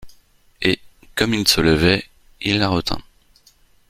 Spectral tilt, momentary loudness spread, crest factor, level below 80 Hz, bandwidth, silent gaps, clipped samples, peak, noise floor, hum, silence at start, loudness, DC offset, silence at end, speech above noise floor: -4 dB/octave; 12 LU; 22 dB; -40 dBFS; 16 kHz; none; under 0.1%; 0 dBFS; -55 dBFS; none; 0 s; -19 LUFS; under 0.1%; 0.9 s; 37 dB